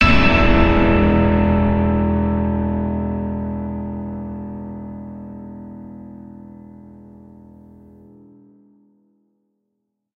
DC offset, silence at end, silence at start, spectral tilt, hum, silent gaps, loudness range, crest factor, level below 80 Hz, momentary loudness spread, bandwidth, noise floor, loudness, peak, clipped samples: under 0.1%; 2.95 s; 0 s; -8 dB/octave; none; none; 23 LU; 20 dB; -28 dBFS; 23 LU; 6.8 kHz; -75 dBFS; -18 LUFS; 0 dBFS; under 0.1%